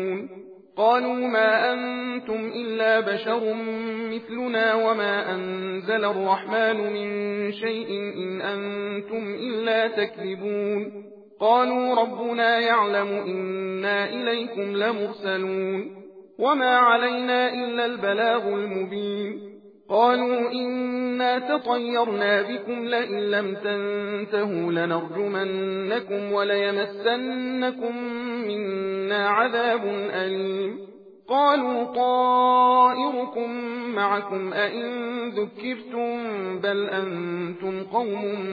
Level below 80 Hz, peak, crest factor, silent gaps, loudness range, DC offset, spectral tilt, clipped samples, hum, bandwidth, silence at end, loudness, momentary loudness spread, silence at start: -80 dBFS; -6 dBFS; 18 dB; none; 5 LU; under 0.1%; -7 dB/octave; under 0.1%; none; 5 kHz; 0 s; -24 LUFS; 10 LU; 0 s